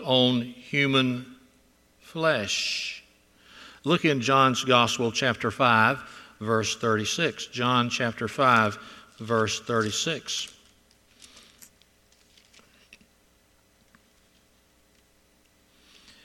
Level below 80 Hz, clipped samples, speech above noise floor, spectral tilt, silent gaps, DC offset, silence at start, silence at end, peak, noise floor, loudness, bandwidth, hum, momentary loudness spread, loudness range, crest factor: -66 dBFS; under 0.1%; 38 dB; -4 dB/octave; none; under 0.1%; 0 s; 5.75 s; -4 dBFS; -63 dBFS; -24 LUFS; 15 kHz; none; 14 LU; 8 LU; 22 dB